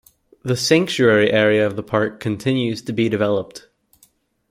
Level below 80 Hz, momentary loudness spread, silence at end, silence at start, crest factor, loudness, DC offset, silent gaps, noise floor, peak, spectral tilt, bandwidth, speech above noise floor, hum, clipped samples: -58 dBFS; 9 LU; 0.9 s; 0.45 s; 18 dB; -18 LUFS; under 0.1%; none; -58 dBFS; -2 dBFS; -5 dB/octave; 16 kHz; 40 dB; none; under 0.1%